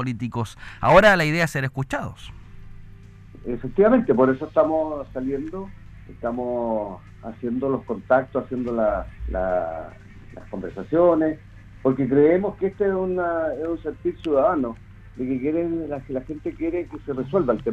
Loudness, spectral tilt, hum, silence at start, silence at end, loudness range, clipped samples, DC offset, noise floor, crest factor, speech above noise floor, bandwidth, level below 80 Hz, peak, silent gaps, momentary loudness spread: -23 LUFS; -7 dB/octave; none; 0 s; 0 s; 5 LU; under 0.1%; under 0.1%; -43 dBFS; 22 dB; 21 dB; 14.5 kHz; -42 dBFS; 0 dBFS; none; 16 LU